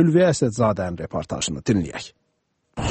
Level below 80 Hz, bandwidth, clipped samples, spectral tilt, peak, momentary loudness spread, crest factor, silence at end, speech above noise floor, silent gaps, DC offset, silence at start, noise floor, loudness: -44 dBFS; 8.8 kHz; under 0.1%; -5.5 dB/octave; -4 dBFS; 16 LU; 16 dB; 0 s; 50 dB; none; under 0.1%; 0 s; -71 dBFS; -22 LUFS